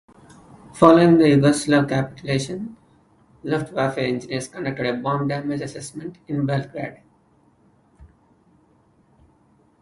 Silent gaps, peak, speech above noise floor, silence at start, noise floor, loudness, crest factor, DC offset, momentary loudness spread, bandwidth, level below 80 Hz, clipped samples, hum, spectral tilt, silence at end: none; 0 dBFS; 39 dB; 0.75 s; -59 dBFS; -20 LUFS; 22 dB; under 0.1%; 19 LU; 11.5 kHz; -54 dBFS; under 0.1%; none; -6.5 dB/octave; 1.75 s